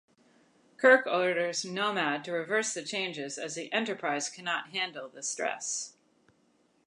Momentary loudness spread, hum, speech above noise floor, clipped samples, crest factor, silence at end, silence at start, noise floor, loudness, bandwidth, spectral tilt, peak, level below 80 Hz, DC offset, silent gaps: 13 LU; none; 39 dB; under 0.1%; 24 dB; 0.95 s; 0.8 s; -69 dBFS; -30 LUFS; 11 kHz; -2 dB/octave; -8 dBFS; -86 dBFS; under 0.1%; none